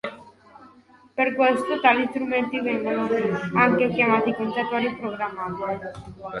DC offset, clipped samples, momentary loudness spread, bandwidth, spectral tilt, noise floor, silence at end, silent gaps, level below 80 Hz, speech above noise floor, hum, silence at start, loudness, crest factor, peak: under 0.1%; under 0.1%; 12 LU; 11.5 kHz; -6.5 dB/octave; -53 dBFS; 0 s; none; -60 dBFS; 30 dB; none; 0.05 s; -23 LUFS; 20 dB; -4 dBFS